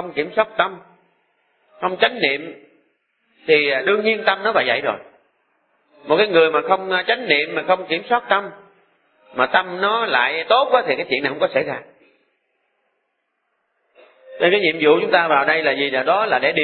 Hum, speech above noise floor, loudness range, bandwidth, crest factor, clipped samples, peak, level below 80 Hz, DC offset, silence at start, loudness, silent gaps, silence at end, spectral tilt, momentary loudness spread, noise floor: none; 54 dB; 5 LU; 4.8 kHz; 18 dB; under 0.1%; -2 dBFS; -68 dBFS; under 0.1%; 0 s; -18 LUFS; none; 0 s; -8.5 dB/octave; 8 LU; -72 dBFS